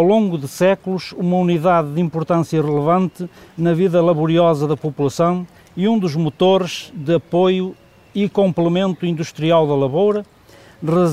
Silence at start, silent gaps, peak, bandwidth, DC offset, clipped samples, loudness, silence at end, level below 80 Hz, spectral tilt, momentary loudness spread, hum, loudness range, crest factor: 0 s; none; -4 dBFS; 14 kHz; 0.1%; under 0.1%; -17 LUFS; 0 s; -58 dBFS; -7 dB/octave; 9 LU; none; 2 LU; 14 dB